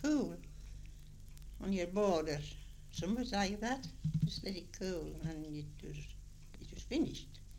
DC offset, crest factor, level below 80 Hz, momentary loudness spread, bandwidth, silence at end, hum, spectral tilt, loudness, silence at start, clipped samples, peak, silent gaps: under 0.1%; 18 dB; -52 dBFS; 20 LU; 16.5 kHz; 0 s; none; -5.5 dB/octave; -39 LUFS; 0 s; under 0.1%; -20 dBFS; none